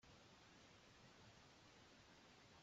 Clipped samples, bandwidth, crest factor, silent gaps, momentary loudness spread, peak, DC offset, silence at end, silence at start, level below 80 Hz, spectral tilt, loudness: under 0.1%; 7.6 kHz; 12 dB; none; 1 LU; -54 dBFS; under 0.1%; 0 s; 0 s; -82 dBFS; -3 dB/octave; -67 LUFS